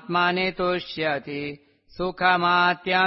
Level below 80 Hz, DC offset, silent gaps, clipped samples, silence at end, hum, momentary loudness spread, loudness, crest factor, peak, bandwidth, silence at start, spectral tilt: -54 dBFS; under 0.1%; none; under 0.1%; 0 s; none; 13 LU; -23 LUFS; 18 dB; -6 dBFS; 5.8 kHz; 0 s; -8.5 dB/octave